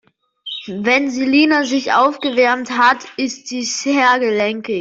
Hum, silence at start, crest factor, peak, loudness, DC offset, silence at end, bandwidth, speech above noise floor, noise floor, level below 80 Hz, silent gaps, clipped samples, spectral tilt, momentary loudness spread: none; 0.45 s; 14 dB; -2 dBFS; -16 LUFS; under 0.1%; 0 s; 7.8 kHz; 20 dB; -36 dBFS; -62 dBFS; none; under 0.1%; -3 dB/octave; 10 LU